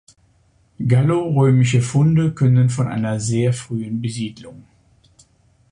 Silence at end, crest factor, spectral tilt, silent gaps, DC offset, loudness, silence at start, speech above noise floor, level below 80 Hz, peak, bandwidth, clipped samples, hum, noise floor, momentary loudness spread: 1.1 s; 14 dB; -7 dB/octave; none; under 0.1%; -18 LUFS; 0.8 s; 41 dB; -50 dBFS; -4 dBFS; 10.5 kHz; under 0.1%; none; -58 dBFS; 10 LU